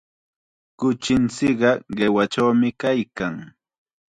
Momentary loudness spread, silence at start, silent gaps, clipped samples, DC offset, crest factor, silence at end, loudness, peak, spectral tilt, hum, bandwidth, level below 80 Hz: 9 LU; 0.8 s; none; under 0.1%; under 0.1%; 18 dB; 0.7 s; -21 LUFS; -4 dBFS; -5.5 dB/octave; none; 9.6 kHz; -54 dBFS